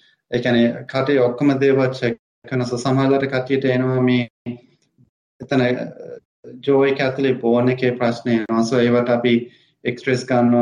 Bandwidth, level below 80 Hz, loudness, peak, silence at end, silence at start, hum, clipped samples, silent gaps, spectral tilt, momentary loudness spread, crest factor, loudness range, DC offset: 10 kHz; -60 dBFS; -19 LUFS; -4 dBFS; 0 s; 0.3 s; none; under 0.1%; 2.19-2.42 s, 4.30-4.45 s, 5.09-5.39 s, 6.25-6.43 s; -7 dB/octave; 11 LU; 14 dB; 4 LU; under 0.1%